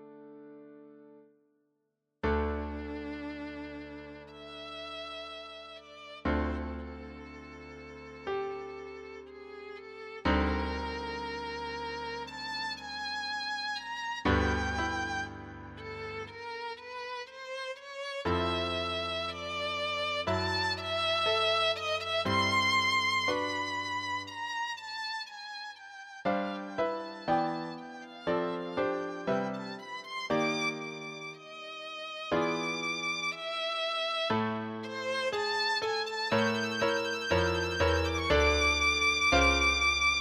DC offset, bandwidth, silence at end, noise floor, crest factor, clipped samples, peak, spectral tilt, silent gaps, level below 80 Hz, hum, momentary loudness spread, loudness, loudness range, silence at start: under 0.1%; 14 kHz; 0 s; -81 dBFS; 20 dB; under 0.1%; -14 dBFS; -4 dB/octave; none; -46 dBFS; none; 19 LU; -31 LUFS; 11 LU; 0 s